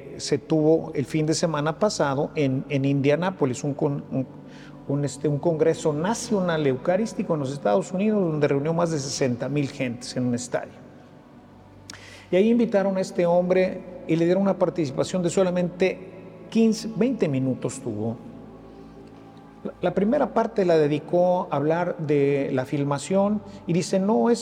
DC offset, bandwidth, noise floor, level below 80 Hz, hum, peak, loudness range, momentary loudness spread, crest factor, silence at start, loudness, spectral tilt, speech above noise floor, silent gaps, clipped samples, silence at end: under 0.1%; 13 kHz; -48 dBFS; -58 dBFS; none; -8 dBFS; 5 LU; 10 LU; 16 dB; 0 s; -24 LUFS; -6 dB/octave; 25 dB; none; under 0.1%; 0 s